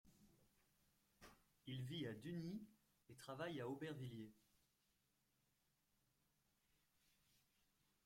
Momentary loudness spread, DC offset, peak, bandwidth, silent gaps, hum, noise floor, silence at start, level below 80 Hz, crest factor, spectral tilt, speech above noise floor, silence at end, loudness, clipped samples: 19 LU; under 0.1%; -38 dBFS; 16.5 kHz; none; none; -85 dBFS; 0.05 s; -84 dBFS; 20 dB; -6 dB/octave; 34 dB; 3.65 s; -52 LUFS; under 0.1%